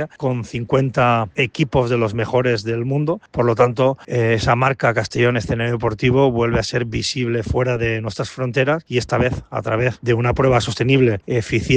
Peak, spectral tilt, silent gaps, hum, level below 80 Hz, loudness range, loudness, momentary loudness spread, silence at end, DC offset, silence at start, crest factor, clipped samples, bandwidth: -2 dBFS; -6.5 dB/octave; none; none; -40 dBFS; 2 LU; -19 LUFS; 6 LU; 0 s; under 0.1%; 0 s; 16 dB; under 0.1%; 9.4 kHz